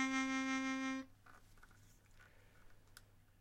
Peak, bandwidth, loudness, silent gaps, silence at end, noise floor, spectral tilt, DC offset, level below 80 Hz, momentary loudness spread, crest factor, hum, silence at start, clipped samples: -26 dBFS; 15 kHz; -40 LUFS; none; 0.35 s; -65 dBFS; -2.5 dB/octave; under 0.1%; -68 dBFS; 26 LU; 20 dB; none; 0 s; under 0.1%